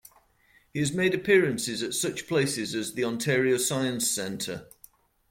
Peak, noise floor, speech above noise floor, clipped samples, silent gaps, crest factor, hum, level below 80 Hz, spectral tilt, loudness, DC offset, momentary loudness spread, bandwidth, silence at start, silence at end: -10 dBFS; -63 dBFS; 36 dB; under 0.1%; none; 18 dB; none; -64 dBFS; -3.5 dB/octave; -26 LUFS; under 0.1%; 10 LU; 16.5 kHz; 0.75 s; 0.65 s